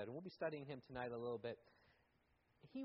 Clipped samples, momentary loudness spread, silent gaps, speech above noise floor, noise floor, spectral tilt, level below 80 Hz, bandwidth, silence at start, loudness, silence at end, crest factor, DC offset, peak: under 0.1%; 7 LU; none; 31 dB; -80 dBFS; -5 dB/octave; -80 dBFS; 5.6 kHz; 0 s; -49 LUFS; 0 s; 20 dB; under 0.1%; -32 dBFS